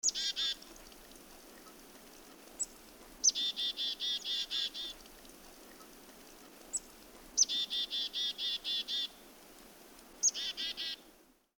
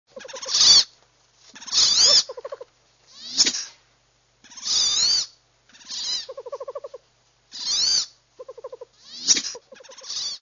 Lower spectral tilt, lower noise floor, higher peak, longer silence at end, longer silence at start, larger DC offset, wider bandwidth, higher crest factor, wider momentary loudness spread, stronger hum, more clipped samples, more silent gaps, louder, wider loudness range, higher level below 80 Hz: about the same, 2 dB/octave vs 2 dB/octave; about the same, -64 dBFS vs -63 dBFS; second, -16 dBFS vs -2 dBFS; first, 0.5 s vs 0.05 s; about the same, 0.05 s vs 0.15 s; neither; first, over 20 kHz vs 7.6 kHz; about the same, 24 dB vs 22 dB; about the same, 24 LU vs 26 LU; neither; neither; neither; second, -34 LUFS vs -18 LUFS; second, 4 LU vs 8 LU; about the same, -66 dBFS vs -62 dBFS